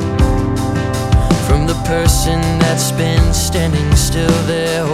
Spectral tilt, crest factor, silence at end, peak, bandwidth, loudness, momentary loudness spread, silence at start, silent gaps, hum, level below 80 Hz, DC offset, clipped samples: -5 dB/octave; 14 dB; 0 s; 0 dBFS; 16 kHz; -14 LUFS; 3 LU; 0 s; none; none; -20 dBFS; under 0.1%; under 0.1%